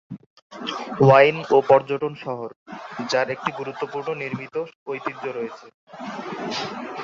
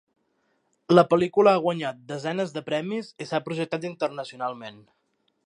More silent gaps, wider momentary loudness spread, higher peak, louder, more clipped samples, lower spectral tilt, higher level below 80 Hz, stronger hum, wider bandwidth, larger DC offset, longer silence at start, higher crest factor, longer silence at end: first, 0.26-0.50 s, 2.56-2.66 s, 4.75-4.86 s, 5.74-5.87 s vs none; first, 19 LU vs 14 LU; about the same, -2 dBFS vs -4 dBFS; first, -22 LUFS vs -25 LUFS; neither; about the same, -6 dB/octave vs -6.5 dB/octave; first, -66 dBFS vs -72 dBFS; neither; second, 7.6 kHz vs 10.5 kHz; neither; second, 0.1 s vs 0.9 s; about the same, 22 dB vs 22 dB; second, 0 s vs 0.75 s